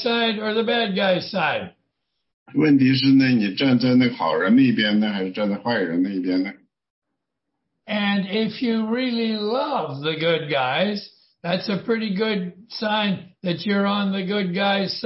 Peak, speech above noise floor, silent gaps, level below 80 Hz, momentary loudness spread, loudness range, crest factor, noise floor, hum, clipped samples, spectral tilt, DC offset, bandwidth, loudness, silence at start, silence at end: -8 dBFS; 59 dB; 2.34-2.46 s, 6.90-7.02 s; -66 dBFS; 10 LU; 7 LU; 14 dB; -80 dBFS; none; under 0.1%; -9 dB/octave; under 0.1%; 5.8 kHz; -21 LUFS; 0 s; 0 s